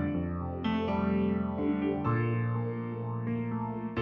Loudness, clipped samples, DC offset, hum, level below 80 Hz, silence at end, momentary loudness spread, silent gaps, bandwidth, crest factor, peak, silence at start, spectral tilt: -32 LUFS; under 0.1%; under 0.1%; none; -52 dBFS; 0 s; 6 LU; none; 5.6 kHz; 12 dB; -18 dBFS; 0 s; -10 dB/octave